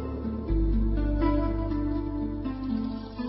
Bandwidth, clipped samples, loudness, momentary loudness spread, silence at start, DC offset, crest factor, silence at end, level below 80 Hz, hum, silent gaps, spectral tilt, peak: 5.6 kHz; under 0.1%; -29 LUFS; 7 LU; 0 s; under 0.1%; 14 dB; 0 s; -30 dBFS; none; none; -12 dB/octave; -14 dBFS